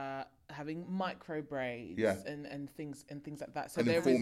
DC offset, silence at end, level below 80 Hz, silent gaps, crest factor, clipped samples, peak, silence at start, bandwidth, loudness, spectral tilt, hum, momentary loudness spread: under 0.1%; 0 s; -70 dBFS; none; 20 dB; under 0.1%; -16 dBFS; 0 s; 15.5 kHz; -38 LUFS; -6 dB/octave; none; 14 LU